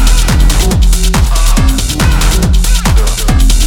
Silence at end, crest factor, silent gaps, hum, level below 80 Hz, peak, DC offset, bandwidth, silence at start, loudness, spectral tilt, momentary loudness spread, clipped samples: 0 s; 8 dB; none; none; -8 dBFS; 0 dBFS; under 0.1%; 17 kHz; 0 s; -11 LUFS; -4 dB/octave; 1 LU; under 0.1%